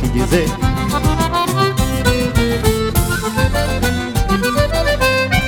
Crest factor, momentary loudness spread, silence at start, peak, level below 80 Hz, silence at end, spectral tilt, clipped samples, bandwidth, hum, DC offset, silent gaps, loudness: 14 dB; 3 LU; 0 s; 0 dBFS; -22 dBFS; 0 s; -5 dB/octave; under 0.1%; over 20 kHz; none; under 0.1%; none; -16 LUFS